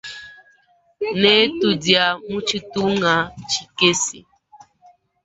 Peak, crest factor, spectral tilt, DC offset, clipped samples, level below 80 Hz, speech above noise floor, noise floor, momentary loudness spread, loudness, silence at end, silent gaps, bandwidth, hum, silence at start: 0 dBFS; 20 dB; -3 dB/octave; under 0.1%; under 0.1%; -56 dBFS; 40 dB; -58 dBFS; 11 LU; -18 LUFS; 1.05 s; none; 8.2 kHz; none; 0.05 s